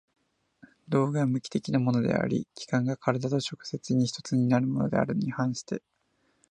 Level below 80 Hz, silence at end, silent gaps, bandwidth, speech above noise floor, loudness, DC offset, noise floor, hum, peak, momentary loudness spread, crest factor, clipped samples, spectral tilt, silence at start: -64 dBFS; 0.7 s; none; 9.8 kHz; 42 dB; -28 LUFS; under 0.1%; -69 dBFS; none; -8 dBFS; 7 LU; 20 dB; under 0.1%; -6.5 dB/octave; 0.9 s